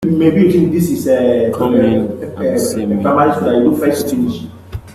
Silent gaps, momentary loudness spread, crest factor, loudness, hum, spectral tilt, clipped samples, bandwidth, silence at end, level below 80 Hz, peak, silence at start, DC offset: none; 9 LU; 12 dB; -14 LUFS; none; -7 dB/octave; under 0.1%; 14.5 kHz; 0 s; -44 dBFS; 0 dBFS; 0 s; under 0.1%